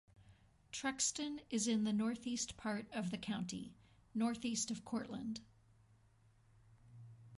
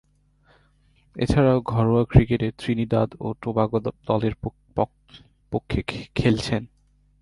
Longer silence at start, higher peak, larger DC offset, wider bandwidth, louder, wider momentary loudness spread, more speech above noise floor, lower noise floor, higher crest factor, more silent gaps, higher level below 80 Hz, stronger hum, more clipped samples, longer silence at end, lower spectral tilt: second, 0.2 s vs 1.15 s; second, -26 dBFS vs -2 dBFS; neither; about the same, 11.5 kHz vs 11.5 kHz; second, -41 LUFS vs -23 LUFS; about the same, 13 LU vs 11 LU; second, 29 dB vs 38 dB; first, -70 dBFS vs -60 dBFS; about the same, 18 dB vs 22 dB; neither; second, -72 dBFS vs -38 dBFS; neither; neither; second, 0 s vs 0.55 s; second, -3.5 dB/octave vs -8 dB/octave